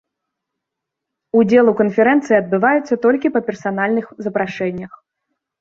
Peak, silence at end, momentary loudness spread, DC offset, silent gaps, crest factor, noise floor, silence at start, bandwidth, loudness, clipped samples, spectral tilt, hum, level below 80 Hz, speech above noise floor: -2 dBFS; 0.75 s; 11 LU; under 0.1%; none; 16 dB; -81 dBFS; 1.35 s; 7.4 kHz; -16 LUFS; under 0.1%; -7.5 dB/octave; none; -60 dBFS; 66 dB